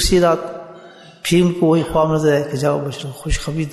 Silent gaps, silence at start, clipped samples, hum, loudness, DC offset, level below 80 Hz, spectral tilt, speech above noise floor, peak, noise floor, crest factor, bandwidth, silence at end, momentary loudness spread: none; 0 s; under 0.1%; none; -18 LUFS; under 0.1%; -32 dBFS; -5.5 dB/octave; 25 dB; -2 dBFS; -41 dBFS; 14 dB; 12.5 kHz; 0 s; 13 LU